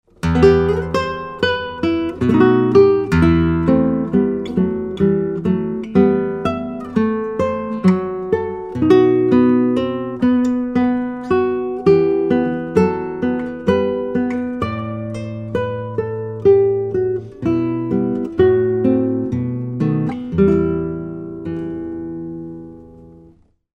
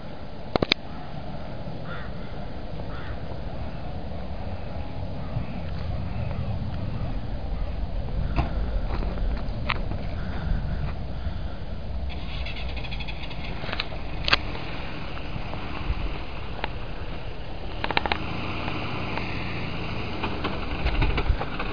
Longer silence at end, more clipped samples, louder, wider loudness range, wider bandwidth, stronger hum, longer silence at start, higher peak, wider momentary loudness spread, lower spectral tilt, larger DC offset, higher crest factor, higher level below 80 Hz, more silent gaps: first, 0.65 s vs 0 s; neither; first, -17 LUFS vs -31 LUFS; about the same, 5 LU vs 5 LU; first, 8.4 kHz vs 5.2 kHz; neither; first, 0.25 s vs 0 s; about the same, 0 dBFS vs 0 dBFS; about the same, 12 LU vs 10 LU; first, -8.5 dB/octave vs -6.5 dB/octave; second, under 0.1% vs 2%; second, 16 dB vs 30 dB; second, -38 dBFS vs -32 dBFS; neither